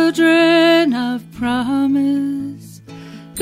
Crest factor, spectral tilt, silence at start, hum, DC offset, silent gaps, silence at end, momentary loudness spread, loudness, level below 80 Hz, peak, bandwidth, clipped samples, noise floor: 12 dB; -4.5 dB/octave; 0 s; none; under 0.1%; none; 0 s; 24 LU; -15 LUFS; -54 dBFS; -4 dBFS; 15.5 kHz; under 0.1%; -36 dBFS